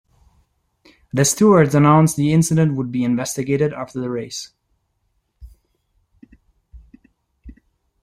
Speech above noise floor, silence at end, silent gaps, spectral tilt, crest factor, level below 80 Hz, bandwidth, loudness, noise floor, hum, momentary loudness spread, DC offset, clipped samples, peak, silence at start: 52 dB; 0.5 s; none; -6 dB/octave; 18 dB; -50 dBFS; 15.5 kHz; -17 LUFS; -69 dBFS; none; 14 LU; under 0.1%; under 0.1%; -2 dBFS; 1.15 s